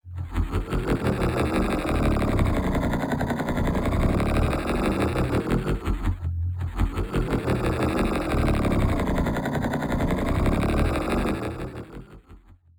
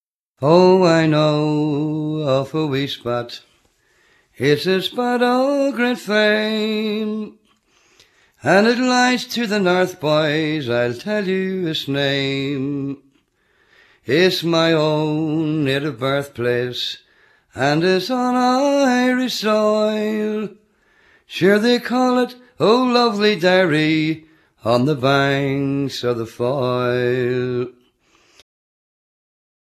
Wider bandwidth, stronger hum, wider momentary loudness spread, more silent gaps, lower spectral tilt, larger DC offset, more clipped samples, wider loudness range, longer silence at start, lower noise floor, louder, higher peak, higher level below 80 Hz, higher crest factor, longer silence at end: first, 19 kHz vs 14 kHz; neither; second, 6 LU vs 9 LU; neither; first, -7 dB/octave vs -5.5 dB/octave; neither; neither; second, 2 LU vs 5 LU; second, 0.05 s vs 0.4 s; second, -50 dBFS vs -61 dBFS; second, -25 LUFS vs -18 LUFS; second, -10 dBFS vs 0 dBFS; first, -30 dBFS vs -60 dBFS; about the same, 14 dB vs 18 dB; second, 0.25 s vs 1.95 s